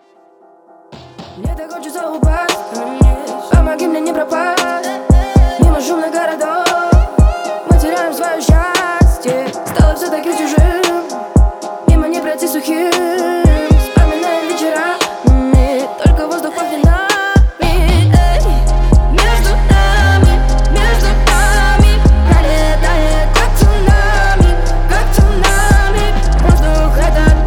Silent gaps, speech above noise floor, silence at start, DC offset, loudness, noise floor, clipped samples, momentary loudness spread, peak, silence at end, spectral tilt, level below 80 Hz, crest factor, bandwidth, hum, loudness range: none; 30 dB; 0.9 s; under 0.1%; -13 LUFS; -46 dBFS; under 0.1%; 6 LU; 0 dBFS; 0 s; -5.5 dB/octave; -12 dBFS; 10 dB; 17 kHz; none; 3 LU